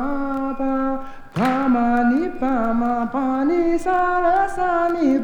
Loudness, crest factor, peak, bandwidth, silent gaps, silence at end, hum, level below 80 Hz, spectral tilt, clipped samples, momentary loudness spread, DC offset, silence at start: -20 LUFS; 12 dB; -6 dBFS; 10.5 kHz; none; 0 s; none; -40 dBFS; -7 dB/octave; under 0.1%; 6 LU; under 0.1%; 0 s